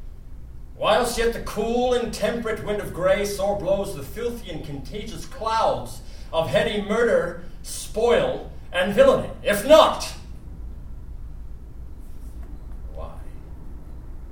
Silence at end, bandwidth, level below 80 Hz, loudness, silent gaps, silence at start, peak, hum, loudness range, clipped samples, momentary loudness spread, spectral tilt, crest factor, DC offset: 0 s; 18 kHz; -38 dBFS; -22 LUFS; none; 0 s; -2 dBFS; none; 20 LU; under 0.1%; 24 LU; -4.5 dB/octave; 22 dB; 0.4%